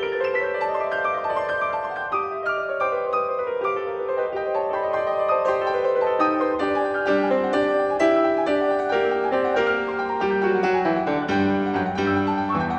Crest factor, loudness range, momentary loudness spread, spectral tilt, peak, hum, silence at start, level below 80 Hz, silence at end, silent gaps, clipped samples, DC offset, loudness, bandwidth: 14 dB; 4 LU; 5 LU; -6.5 dB/octave; -8 dBFS; none; 0 s; -56 dBFS; 0 s; none; under 0.1%; under 0.1%; -22 LUFS; 8.4 kHz